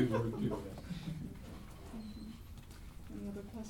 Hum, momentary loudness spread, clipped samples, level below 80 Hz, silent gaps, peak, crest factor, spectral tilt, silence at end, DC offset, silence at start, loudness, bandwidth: none; 16 LU; under 0.1%; -54 dBFS; none; -20 dBFS; 20 dB; -7.5 dB/octave; 0 s; under 0.1%; 0 s; -43 LUFS; 18.5 kHz